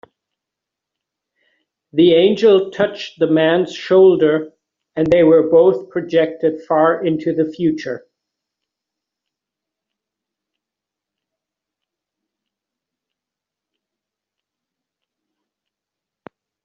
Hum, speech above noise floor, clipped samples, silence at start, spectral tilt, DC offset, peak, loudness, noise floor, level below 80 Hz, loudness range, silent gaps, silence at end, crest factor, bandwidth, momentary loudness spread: none; 71 dB; under 0.1%; 1.95 s; -5 dB/octave; under 0.1%; -2 dBFS; -15 LUFS; -85 dBFS; -58 dBFS; 10 LU; none; 8.65 s; 16 dB; 7.2 kHz; 12 LU